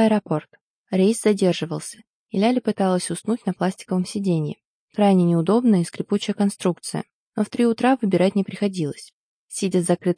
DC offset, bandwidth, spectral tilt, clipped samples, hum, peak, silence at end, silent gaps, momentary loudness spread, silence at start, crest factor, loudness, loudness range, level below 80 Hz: under 0.1%; 10.5 kHz; -6 dB/octave; under 0.1%; none; -6 dBFS; 0.05 s; 0.61-0.84 s, 2.09-2.26 s, 4.65-4.88 s, 7.13-7.32 s, 9.13-9.48 s; 12 LU; 0 s; 16 dB; -22 LUFS; 2 LU; -70 dBFS